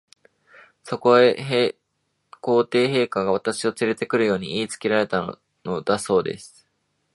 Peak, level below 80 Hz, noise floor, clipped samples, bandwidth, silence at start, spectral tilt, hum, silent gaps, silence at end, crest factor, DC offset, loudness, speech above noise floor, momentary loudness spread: -2 dBFS; -62 dBFS; -73 dBFS; under 0.1%; 11.5 kHz; 0.85 s; -5 dB/octave; none; none; 0.65 s; 20 dB; under 0.1%; -22 LUFS; 52 dB; 14 LU